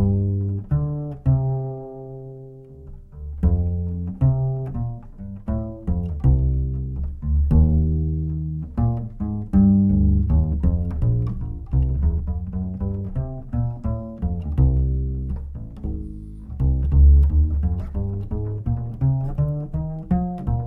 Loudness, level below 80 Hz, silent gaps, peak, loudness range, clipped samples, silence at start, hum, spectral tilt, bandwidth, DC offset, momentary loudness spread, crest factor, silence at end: -23 LUFS; -24 dBFS; none; -6 dBFS; 5 LU; under 0.1%; 0 s; none; -13 dB/octave; 1.9 kHz; under 0.1%; 16 LU; 16 dB; 0 s